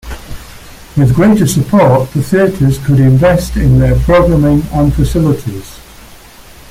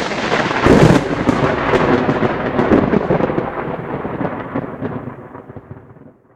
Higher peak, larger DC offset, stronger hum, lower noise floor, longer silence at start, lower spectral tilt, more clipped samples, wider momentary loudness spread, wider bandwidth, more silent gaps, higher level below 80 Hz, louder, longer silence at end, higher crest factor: about the same, 0 dBFS vs 0 dBFS; neither; neither; second, -35 dBFS vs -42 dBFS; about the same, 0.05 s vs 0 s; about the same, -7.5 dB/octave vs -7 dB/octave; neither; second, 14 LU vs 18 LU; first, 16 kHz vs 12.5 kHz; neither; first, -22 dBFS vs -36 dBFS; first, -10 LUFS vs -16 LUFS; first, 0.9 s vs 0.25 s; second, 10 dB vs 16 dB